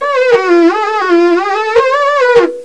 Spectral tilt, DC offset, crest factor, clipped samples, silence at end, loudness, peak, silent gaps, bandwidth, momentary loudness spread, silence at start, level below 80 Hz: -4 dB/octave; 0.7%; 10 dB; under 0.1%; 0 s; -10 LUFS; 0 dBFS; none; 9.2 kHz; 3 LU; 0 s; -52 dBFS